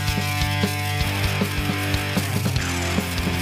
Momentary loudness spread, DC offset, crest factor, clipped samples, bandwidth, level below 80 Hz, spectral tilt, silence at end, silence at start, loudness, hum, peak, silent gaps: 1 LU; under 0.1%; 16 dB; under 0.1%; 16 kHz; -34 dBFS; -4.5 dB/octave; 0 s; 0 s; -23 LUFS; none; -8 dBFS; none